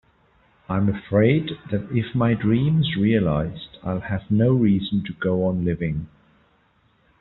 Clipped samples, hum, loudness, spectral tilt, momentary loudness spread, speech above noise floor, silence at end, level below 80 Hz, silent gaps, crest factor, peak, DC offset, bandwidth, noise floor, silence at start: under 0.1%; none; -22 LUFS; -7 dB/octave; 10 LU; 41 dB; 1.15 s; -48 dBFS; none; 18 dB; -4 dBFS; under 0.1%; 4.1 kHz; -62 dBFS; 0.7 s